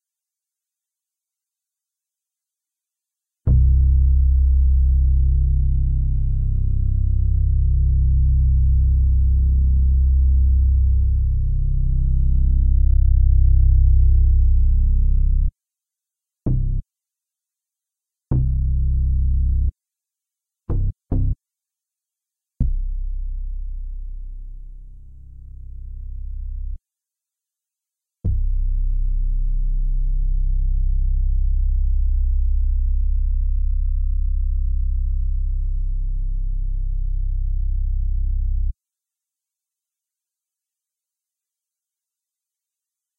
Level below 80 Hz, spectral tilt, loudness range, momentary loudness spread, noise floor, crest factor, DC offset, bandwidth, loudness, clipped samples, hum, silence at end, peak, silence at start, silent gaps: -18 dBFS; -14 dB/octave; 14 LU; 15 LU; -87 dBFS; 12 dB; under 0.1%; 0.9 kHz; -21 LUFS; under 0.1%; none; 4.45 s; -6 dBFS; 3.45 s; none